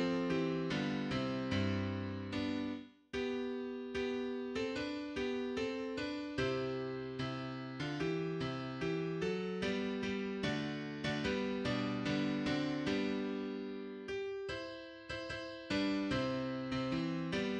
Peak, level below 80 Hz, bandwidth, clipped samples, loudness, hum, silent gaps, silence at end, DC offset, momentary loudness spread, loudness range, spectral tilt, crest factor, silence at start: -24 dBFS; -62 dBFS; 9.6 kHz; under 0.1%; -38 LUFS; none; none; 0 s; under 0.1%; 7 LU; 3 LU; -6 dB/octave; 14 dB; 0 s